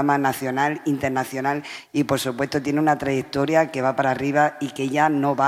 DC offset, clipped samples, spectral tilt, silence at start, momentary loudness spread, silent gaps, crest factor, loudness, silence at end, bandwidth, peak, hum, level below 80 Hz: under 0.1%; under 0.1%; -5.5 dB/octave; 0 s; 5 LU; none; 16 dB; -22 LUFS; 0 s; 16 kHz; -4 dBFS; none; -60 dBFS